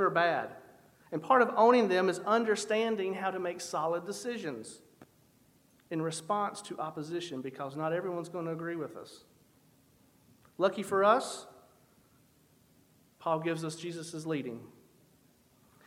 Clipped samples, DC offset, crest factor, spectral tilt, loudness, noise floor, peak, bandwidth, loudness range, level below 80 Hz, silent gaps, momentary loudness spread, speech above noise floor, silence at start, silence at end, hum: under 0.1%; under 0.1%; 22 dB; -4.5 dB/octave; -32 LUFS; -65 dBFS; -10 dBFS; 16 kHz; 10 LU; -80 dBFS; none; 15 LU; 34 dB; 0 s; 1.15 s; none